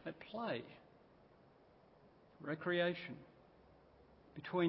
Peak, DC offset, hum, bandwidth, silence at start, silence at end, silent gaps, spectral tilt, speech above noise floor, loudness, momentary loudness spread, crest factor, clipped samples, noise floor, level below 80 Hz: -24 dBFS; under 0.1%; none; 5.6 kHz; 0.05 s; 0 s; none; -4 dB/octave; 27 dB; -42 LUFS; 21 LU; 22 dB; under 0.1%; -67 dBFS; -78 dBFS